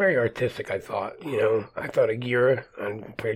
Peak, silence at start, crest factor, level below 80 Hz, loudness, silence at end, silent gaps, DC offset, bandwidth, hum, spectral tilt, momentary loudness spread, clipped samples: -10 dBFS; 0 s; 16 dB; -60 dBFS; -26 LUFS; 0 s; none; under 0.1%; 15.5 kHz; none; -7 dB/octave; 10 LU; under 0.1%